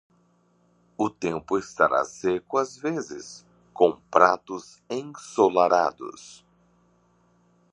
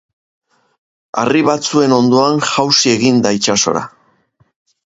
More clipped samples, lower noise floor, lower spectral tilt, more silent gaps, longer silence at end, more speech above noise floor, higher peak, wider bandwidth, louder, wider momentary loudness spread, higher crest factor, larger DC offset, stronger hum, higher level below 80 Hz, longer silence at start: neither; first, -64 dBFS vs -56 dBFS; first, -5 dB/octave vs -3.5 dB/octave; neither; first, 1.4 s vs 1 s; second, 40 dB vs 44 dB; about the same, -2 dBFS vs 0 dBFS; first, 10.5 kHz vs 8 kHz; second, -24 LUFS vs -13 LUFS; first, 18 LU vs 8 LU; first, 24 dB vs 14 dB; neither; neither; second, -66 dBFS vs -56 dBFS; second, 1 s vs 1.15 s